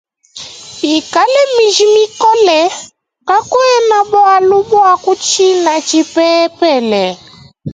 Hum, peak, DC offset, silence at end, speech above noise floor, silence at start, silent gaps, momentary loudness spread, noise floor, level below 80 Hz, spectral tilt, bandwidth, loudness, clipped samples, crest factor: none; 0 dBFS; under 0.1%; 0 s; 22 dB; 0.35 s; none; 17 LU; -32 dBFS; -54 dBFS; -2.5 dB/octave; 9.4 kHz; -10 LUFS; under 0.1%; 10 dB